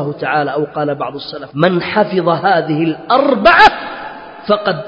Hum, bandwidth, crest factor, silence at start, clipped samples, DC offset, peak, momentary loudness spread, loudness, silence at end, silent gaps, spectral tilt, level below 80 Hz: none; 8 kHz; 14 dB; 0 s; 0.3%; under 0.1%; 0 dBFS; 17 LU; -13 LUFS; 0 s; none; -6.5 dB/octave; -46 dBFS